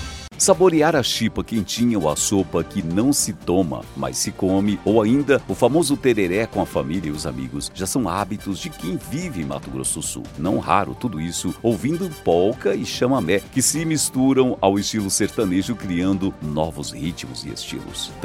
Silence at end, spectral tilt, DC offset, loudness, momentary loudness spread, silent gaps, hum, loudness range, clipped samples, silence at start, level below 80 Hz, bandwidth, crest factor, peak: 0 s; -4.5 dB/octave; under 0.1%; -21 LUFS; 10 LU; none; none; 5 LU; under 0.1%; 0 s; -44 dBFS; 16.5 kHz; 20 dB; 0 dBFS